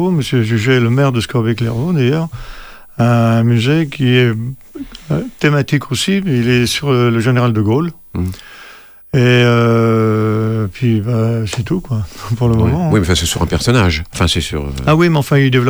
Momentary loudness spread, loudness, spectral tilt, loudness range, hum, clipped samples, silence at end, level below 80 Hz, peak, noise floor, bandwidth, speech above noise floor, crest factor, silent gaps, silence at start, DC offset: 10 LU; -14 LUFS; -6 dB/octave; 2 LU; none; under 0.1%; 0 s; -34 dBFS; -2 dBFS; -38 dBFS; over 20 kHz; 25 dB; 12 dB; none; 0 s; under 0.1%